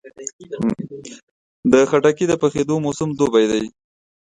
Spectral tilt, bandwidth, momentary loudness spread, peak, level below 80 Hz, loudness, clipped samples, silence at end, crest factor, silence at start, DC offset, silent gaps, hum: -5.5 dB/octave; 9.6 kHz; 17 LU; 0 dBFS; -54 dBFS; -18 LUFS; under 0.1%; 0.55 s; 18 dB; 0.05 s; under 0.1%; 0.33-0.39 s, 1.23-1.63 s; none